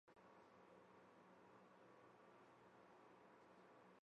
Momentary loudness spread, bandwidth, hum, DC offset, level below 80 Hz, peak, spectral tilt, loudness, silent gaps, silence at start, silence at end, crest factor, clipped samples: 1 LU; 7.2 kHz; none; under 0.1%; under -90 dBFS; -56 dBFS; -4 dB/octave; -69 LUFS; none; 0.05 s; 0.05 s; 14 dB; under 0.1%